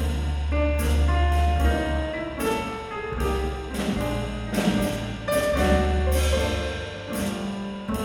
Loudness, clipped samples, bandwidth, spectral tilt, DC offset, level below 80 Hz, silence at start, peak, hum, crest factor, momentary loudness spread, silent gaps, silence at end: -25 LUFS; under 0.1%; 17.5 kHz; -6 dB/octave; under 0.1%; -28 dBFS; 0 s; -8 dBFS; none; 16 dB; 8 LU; none; 0 s